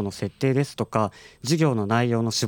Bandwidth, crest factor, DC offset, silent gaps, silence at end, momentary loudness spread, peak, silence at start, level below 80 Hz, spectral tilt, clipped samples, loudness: 18.5 kHz; 18 dB; under 0.1%; none; 0 s; 8 LU; -4 dBFS; 0 s; -62 dBFS; -5.5 dB/octave; under 0.1%; -24 LUFS